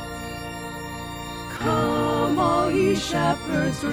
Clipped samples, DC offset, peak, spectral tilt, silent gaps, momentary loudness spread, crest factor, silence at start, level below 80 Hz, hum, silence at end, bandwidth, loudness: under 0.1%; under 0.1%; -10 dBFS; -5.5 dB/octave; none; 12 LU; 14 dB; 0 s; -44 dBFS; none; 0 s; 17.5 kHz; -24 LUFS